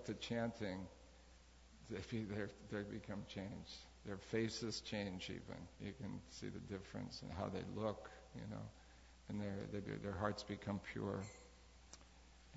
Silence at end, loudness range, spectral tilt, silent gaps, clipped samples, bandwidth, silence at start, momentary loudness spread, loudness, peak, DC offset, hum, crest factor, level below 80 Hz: 0 s; 3 LU; -5 dB/octave; none; under 0.1%; 7.6 kHz; 0 s; 20 LU; -47 LUFS; -24 dBFS; under 0.1%; none; 24 dB; -66 dBFS